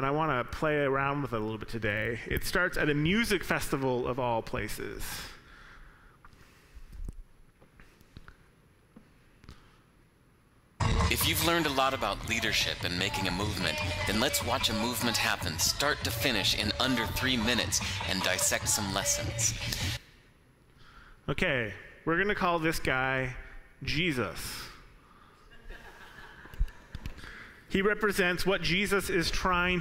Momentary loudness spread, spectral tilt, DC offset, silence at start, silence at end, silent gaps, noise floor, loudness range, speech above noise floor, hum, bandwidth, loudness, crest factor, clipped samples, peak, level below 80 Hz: 15 LU; -3 dB/octave; under 0.1%; 0 s; 0 s; none; -63 dBFS; 10 LU; 33 dB; none; 16 kHz; -29 LUFS; 18 dB; under 0.1%; -12 dBFS; -44 dBFS